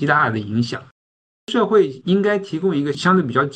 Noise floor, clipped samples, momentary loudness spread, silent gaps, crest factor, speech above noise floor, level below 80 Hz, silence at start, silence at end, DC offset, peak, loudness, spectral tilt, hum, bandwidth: under -90 dBFS; under 0.1%; 7 LU; 0.91-1.47 s; 16 dB; over 72 dB; -64 dBFS; 0 s; 0 s; under 0.1%; -2 dBFS; -19 LUFS; -6.5 dB/octave; none; 9.2 kHz